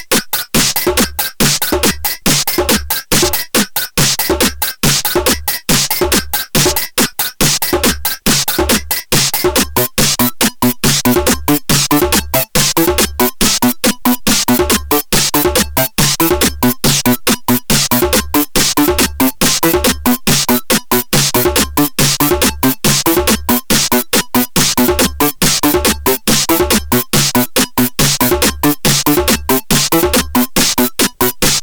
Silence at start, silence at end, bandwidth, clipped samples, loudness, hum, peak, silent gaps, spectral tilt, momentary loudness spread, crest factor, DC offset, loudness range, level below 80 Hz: 0 s; 0 s; over 20 kHz; under 0.1%; -12 LUFS; none; -2 dBFS; none; -3 dB/octave; 3 LU; 10 dB; under 0.1%; 1 LU; -28 dBFS